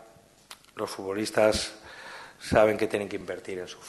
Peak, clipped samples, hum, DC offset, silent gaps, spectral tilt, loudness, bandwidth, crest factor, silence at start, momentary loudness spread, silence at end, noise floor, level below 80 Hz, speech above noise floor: -6 dBFS; under 0.1%; none; under 0.1%; none; -4 dB/octave; -27 LUFS; 12.5 kHz; 22 dB; 0.5 s; 21 LU; 0 s; -55 dBFS; -54 dBFS; 28 dB